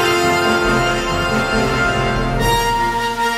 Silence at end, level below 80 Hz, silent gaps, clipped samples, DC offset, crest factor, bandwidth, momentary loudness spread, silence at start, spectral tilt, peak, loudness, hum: 0 s; -28 dBFS; none; under 0.1%; under 0.1%; 14 dB; 16 kHz; 3 LU; 0 s; -4.5 dB/octave; -2 dBFS; -16 LUFS; none